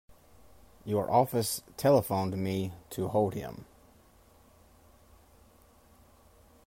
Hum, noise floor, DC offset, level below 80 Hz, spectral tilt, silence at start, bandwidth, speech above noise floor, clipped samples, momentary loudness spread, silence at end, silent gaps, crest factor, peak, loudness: none; -60 dBFS; under 0.1%; -62 dBFS; -6 dB/octave; 0.1 s; 16 kHz; 31 dB; under 0.1%; 15 LU; 3.05 s; none; 22 dB; -12 dBFS; -30 LUFS